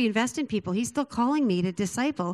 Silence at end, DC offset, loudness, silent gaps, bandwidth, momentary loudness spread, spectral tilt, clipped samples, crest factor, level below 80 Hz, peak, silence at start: 0 s; under 0.1%; -27 LUFS; none; 13.5 kHz; 4 LU; -5 dB/octave; under 0.1%; 16 dB; -62 dBFS; -12 dBFS; 0 s